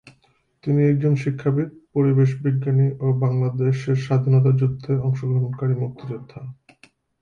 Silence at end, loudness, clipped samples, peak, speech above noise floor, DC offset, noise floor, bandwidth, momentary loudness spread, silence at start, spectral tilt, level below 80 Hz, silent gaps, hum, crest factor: 0.7 s; -21 LUFS; under 0.1%; -8 dBFS; 43 dB; under 0.1%; -62 dBFS; 6.8 kHz; 14 LU; 0.65 s; -10 dB/octave; -58 dBFS; none; none; 12 dB